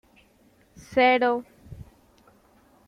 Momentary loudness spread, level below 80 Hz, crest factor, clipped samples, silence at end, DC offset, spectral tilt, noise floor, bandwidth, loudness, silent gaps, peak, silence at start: 27 LU; -58 dBFS; 20 dB; under 0.1%; 1.05 s; under 0.1%; -5 dB/octave; -60 dBFS; 11 kHz; -22 LUFS; none; -8 dBFS; 0.9 s